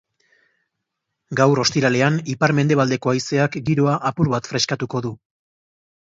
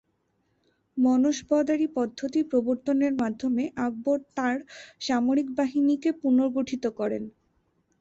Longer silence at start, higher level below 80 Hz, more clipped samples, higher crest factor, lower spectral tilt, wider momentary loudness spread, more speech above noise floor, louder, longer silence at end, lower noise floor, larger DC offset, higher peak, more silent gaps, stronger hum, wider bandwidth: first, 1.3 s vs 0.95 s; first, -56 dBFS vs -66 dBFS; neither; about the same, 18 dB vs 14 dB; about the same, -5.5 dB/octave vs -5 dB/octave; about the same, 7 LU vs 7 LU; first, 60 dB vs 47 dB; first, -19 LUFS vs -26 LUFS; first, 0.95 s vs 0.7 s; first, -79 dBFS vs -72 dBFS; neither; first, -2 dBFS vs -12 dBFS; neither; neither; about the same, 7.8 kHz vs 7.8 kHz